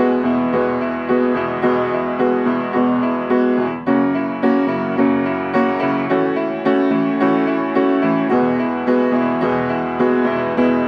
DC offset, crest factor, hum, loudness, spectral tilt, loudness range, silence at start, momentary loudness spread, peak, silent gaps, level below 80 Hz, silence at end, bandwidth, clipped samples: under 0.1%; 14 dB; none; -17 LUFS; -8.5 dB/octave; 1 LU; 0 s; 3 LU; -4 dBFS; none; -54 dBFS; 0 s; 5.8 kHz; under 0.1%